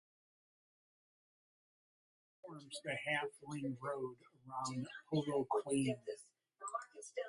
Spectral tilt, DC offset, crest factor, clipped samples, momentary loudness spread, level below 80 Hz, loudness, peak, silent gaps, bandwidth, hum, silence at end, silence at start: -5 dB/octave; under 0.1%; 20 dB; under 0.1%; 14 LU; -80 dBFS; -42 LUFS; -24 dBFS; none; 11.5 kHz; none; 0 s; 2.45 s